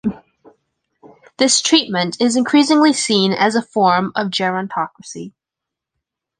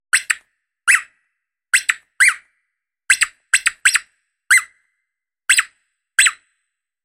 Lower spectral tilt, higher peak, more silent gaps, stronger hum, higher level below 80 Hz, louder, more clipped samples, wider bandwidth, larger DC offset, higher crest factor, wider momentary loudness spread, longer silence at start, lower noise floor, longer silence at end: first, -3 dB/octave vs 6 dB/octave; about the same, -2 dBFS vs 0 dBFS; neither; neither; first, -60 dBFS vs -68 dBFS; about the same, -15 LUFS vs -16 LUFS; neither; second, 10 kHz vs 16 kHz; neither; about the same, 16 dB vs 20 dB; first, 13 LU vs 8 LU; about the same, 0.05 s vs 0.15 s; first, -84 dBFS vs -80 dBFS; first, 1.1 s vs 0.7 s